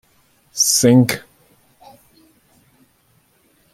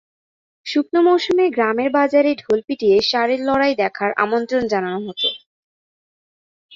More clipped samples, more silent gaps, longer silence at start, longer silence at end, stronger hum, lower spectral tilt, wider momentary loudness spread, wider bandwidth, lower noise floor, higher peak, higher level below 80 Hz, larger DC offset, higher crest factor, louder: neither; second, none vs 5.46-6.69 s; about the same, 0.55 s vs 0.65 s; first, 2.55 s vs 0 s; neither; about the same, -4 dB/octave vs -5 dB/octave; first, 17 LU vs 6 LU; first, 16.5 kHz vs 7.6 kHz; second, -59 dBFS vs under -90 dBFS; about the same, -2 dBFS vs -2 dBFS; about the same, -60 dBFS vs -60 dBFS; neither; about the same, 18 dB vs 18 dB; first, -14 LUFS vs -18 LUFS